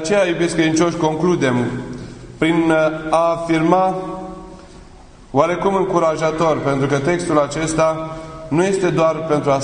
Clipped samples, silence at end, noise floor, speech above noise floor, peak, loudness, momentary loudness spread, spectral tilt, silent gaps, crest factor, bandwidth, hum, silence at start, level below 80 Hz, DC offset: under 0.1%; 0 s; -41 dBFS; 25 dB; 0 dBFS; -17 LUFS; 13 LU; -5.5 dB/octave; none; 18 dB; 10.5 kHz; none; 0 s; -44 dBFS; under 0.1%